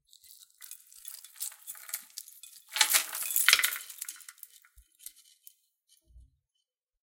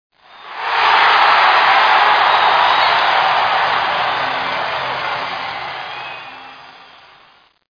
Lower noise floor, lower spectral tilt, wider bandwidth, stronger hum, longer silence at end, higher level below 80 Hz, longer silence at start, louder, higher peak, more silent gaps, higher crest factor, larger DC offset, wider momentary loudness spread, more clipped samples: first, -84 dBFS vs -50 dBFS; second, 4 dB/octave vs -2.5 dB/octave; first, 17 kHz vs 5.4 kHz; neither; second, 0.85 s vs 1.1 s; second, -70 dBFS vs -58 dBFS; first, 0.6 s vs 0.4 s; second, -28 LUFS vs -13 LUFS; about the same, 0 dBFS vs 0 dBFS; neither; first, 34 dB vs 16 dB; neither; first, 26 LU vs 16 LU; neither